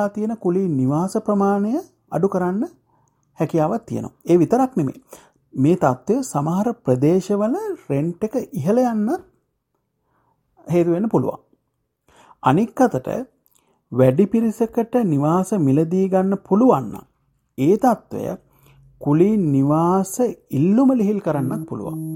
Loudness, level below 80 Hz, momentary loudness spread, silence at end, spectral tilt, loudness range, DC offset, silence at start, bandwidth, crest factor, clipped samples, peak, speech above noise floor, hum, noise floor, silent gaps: -20 LUFS; -58 dBFS; 12 LU; 0 s; -8 dB/octave; 4 LU; under 0.1%; 0 s; 16.5 kHz; 18 dB; under 0.1%; -2 dBFS; 54 dB; none; -73 dBFS; none